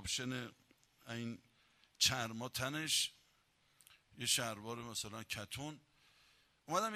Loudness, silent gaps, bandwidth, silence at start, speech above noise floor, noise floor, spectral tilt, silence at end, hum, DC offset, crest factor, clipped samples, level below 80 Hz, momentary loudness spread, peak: -39 LUFS; none; 15 kHz; 0 s; 34 dB; -75 dBFS; -2 dB/octave; 0 s; none; under 0.1%; 24 dB; under 0.1%; -70 dBFS; 15 LU; -18 dBFS